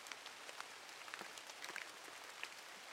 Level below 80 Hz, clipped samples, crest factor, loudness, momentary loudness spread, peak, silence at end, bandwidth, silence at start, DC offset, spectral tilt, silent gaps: under -90 dBFS; under 0.1%; 26 dB; -51 LUFS; 4 LU; -26 dBFS; 0 s; 16.5 kHz; 0 s; under 0.1%; 0.5 dB/octave; none